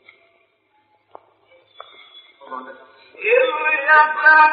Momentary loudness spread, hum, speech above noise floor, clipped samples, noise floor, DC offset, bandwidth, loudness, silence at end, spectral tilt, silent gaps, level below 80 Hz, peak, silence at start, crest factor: 23 LU; none; 47 dB; under 0.1%; -62 dBFS; under 0.1%; 5 kHz; -14 LUFS; 0 s; 3.5 dB/octave; none; -82 dBFS; 0 dBFS; 2.5 s; 18 dB